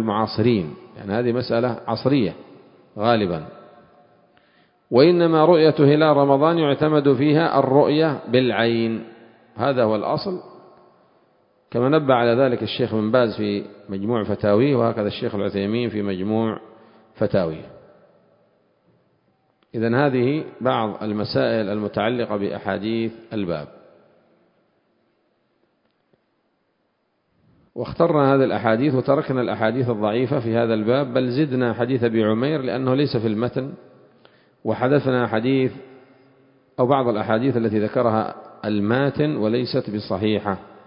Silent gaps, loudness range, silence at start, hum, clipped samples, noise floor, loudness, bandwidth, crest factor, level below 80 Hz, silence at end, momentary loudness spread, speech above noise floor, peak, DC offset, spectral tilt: none; 9 LU; 0 s; none; under 0.1%; -69 dBFS; -20 LUFS; 5.4 kHz; 20 dB; -56 dBFS; 0.2 s; 12 LU; 49 dB; -2 dBFS; under 0.1%; -11.5 dB/octave